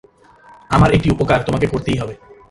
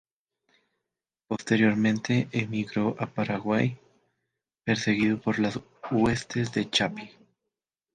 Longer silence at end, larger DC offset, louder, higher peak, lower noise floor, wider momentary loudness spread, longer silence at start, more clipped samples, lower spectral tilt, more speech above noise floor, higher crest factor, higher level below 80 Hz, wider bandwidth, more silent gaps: second, 0.35 s vs 0.85 s; neither; first, -16 LUFS vs -27 LUFS; first, 0 dBFS vs -10 dBFS; second, -46 dBFS vs -88 dBFS; second, 9 LU vs 12 LU; second, 0.7 s vs 1.3 s; neither; first, -7 dB/octave vs -5.5 dB/octave; second, 31 dB vs 61 dB; about the same, 18 dB vs 18 dB; first, -32 dBFS vs -60 dBFS; first, 11.5 kHz vs 9.6 kHz; neither